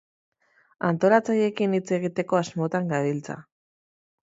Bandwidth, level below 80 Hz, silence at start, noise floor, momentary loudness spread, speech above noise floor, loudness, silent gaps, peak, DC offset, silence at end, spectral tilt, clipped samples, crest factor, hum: 8 kHz; -70 dBFS; 0.8 s; under -90 dBFS; 10 LU; over 66 dB; -24 LUFS; none; -4 dBFS; under 0.1%; 0.8 s; -6.5 dB/octave; under 0.1%; 22 dB; none